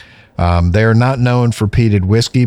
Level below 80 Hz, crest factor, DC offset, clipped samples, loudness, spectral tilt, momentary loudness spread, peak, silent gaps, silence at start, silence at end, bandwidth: -28 dBFS; 10 dB; under 0.1%; under 0.1%; -13 LUFS; -7 dB/octave; 4 LU; -2 dBFS; none; 0.4 s; 0 s; 12 kHz